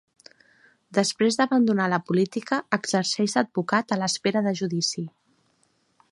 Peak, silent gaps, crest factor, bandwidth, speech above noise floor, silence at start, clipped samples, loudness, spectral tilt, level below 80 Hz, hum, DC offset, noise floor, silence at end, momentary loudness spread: -4 dBFS; none; 20 dB; 11.5 kHz; 44 dB; 0.9 s; under 0.1%; -24 LUFS; -4.5 dB/octave; -72 dBFS; none; under 0.1%; -67 dBFS; 1.05 s; 6 LU